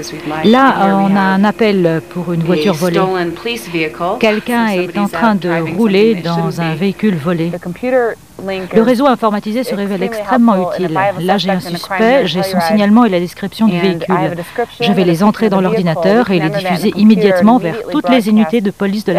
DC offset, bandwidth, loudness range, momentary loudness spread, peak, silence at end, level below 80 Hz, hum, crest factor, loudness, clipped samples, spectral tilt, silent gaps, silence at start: 0.4%; 15.5 kHz; 3 LU; 8 LU; 0 dBFS; 0 s; -50 dBFS; none; 12 dB; -13 LUFS; under 0.1%; -6.5 dB/octave; none; 0 s